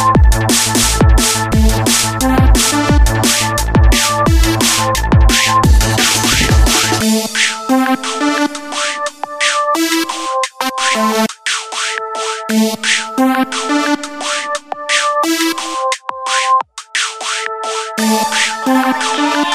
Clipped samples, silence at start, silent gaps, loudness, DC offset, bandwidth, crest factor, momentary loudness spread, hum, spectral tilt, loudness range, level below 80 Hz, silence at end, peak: under 0.1%; 0 s; none; -13 LUFS; 0.3%; 15.5 kHz; 12 dB; 8 LU; none; -3.5 dB/octave; 5 LU; -18 dBFS; 0 s; 0 dBFS